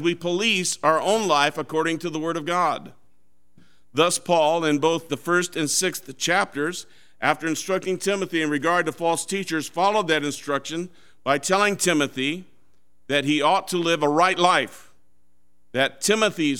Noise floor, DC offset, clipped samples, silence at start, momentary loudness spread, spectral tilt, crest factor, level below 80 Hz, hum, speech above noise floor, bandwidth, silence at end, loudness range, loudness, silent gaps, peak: -70 dBFS; 0.5%; under 0.1%; 0 s; 8 LU; -3 dB/octave; 22 dB; -70 dBFS; none; 47 dB; 17.5 kHz; 0 s; 2 LU; -22 LUFS; none; -2 dBFS